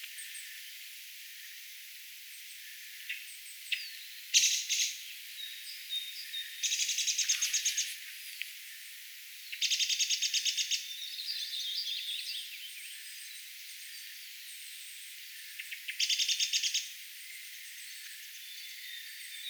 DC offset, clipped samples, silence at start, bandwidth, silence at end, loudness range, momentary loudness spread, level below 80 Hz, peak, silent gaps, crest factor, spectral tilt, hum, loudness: under 0.1%; under 0.1%; 0 s; over 20 kHz; 0 s; 10 LU; 16 LU; under -90 dBFS; -10 dBFS; none; 26 dB; 12.5 dB/octave; none; -33 LUFS